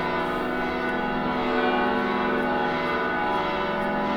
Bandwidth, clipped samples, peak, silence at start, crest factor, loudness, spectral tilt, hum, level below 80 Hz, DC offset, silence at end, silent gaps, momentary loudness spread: 18.5 kHz; under 0.1%; -12 dBFS; 0 s; 14 dB; -25 LUFS; -6.5 dB/octave; none; -46 dBFS; under 0.1%; 0 s; none; 3 LU